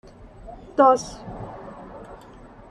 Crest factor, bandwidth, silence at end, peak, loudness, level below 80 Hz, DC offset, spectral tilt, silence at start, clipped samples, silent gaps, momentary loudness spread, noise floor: 22 dB; 11.5 kHz; 0.75 s; -4 dBFS; -19 LUFS; -48 dBFS; under 0.1%; -5 dB/octave; 0.5 s; under 0.1%; none; 26 LU; -45 dBFS